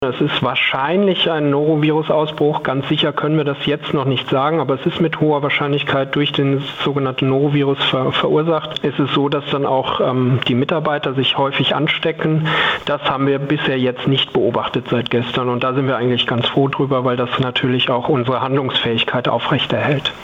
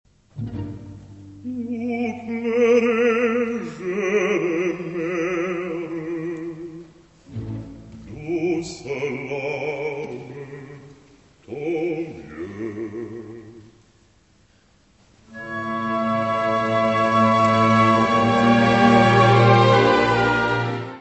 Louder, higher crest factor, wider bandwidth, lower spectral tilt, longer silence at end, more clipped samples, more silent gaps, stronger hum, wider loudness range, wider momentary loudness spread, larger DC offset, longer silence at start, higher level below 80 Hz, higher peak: first, -17 LUFS vs -20 LUFS; second, 12 dB vs 20 dB; second, 7.6 kHz vs 8.4 kHz; about the same, -7.5 dB/octave vs -6.5 dB/octave; about the same, 0 s vs 0 s; neither; neither; neither; second, 1 LU vs 15 LU; second, 3 LU vs 22 LU; neither; second, 0 s vs 0.35 s; about the same, -54 dBFS vs -52 dBFS; second, -6 dBFS vs -2 dBFS